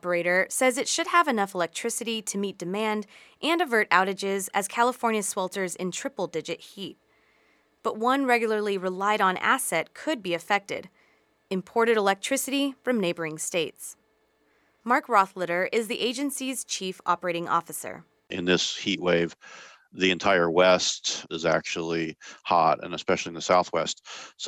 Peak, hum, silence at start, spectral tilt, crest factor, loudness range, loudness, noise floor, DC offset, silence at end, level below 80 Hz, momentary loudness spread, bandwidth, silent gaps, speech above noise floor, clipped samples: -4 dBFS; none; 0.05 s; -3 dB/octave; 22 dB; 4 LU; -26 LUFS; -67 dBFS; under 0.1%; 0 s; -70 dBFS; 12 LU; 17.5 kHz; none; 41 dB; under 0.1%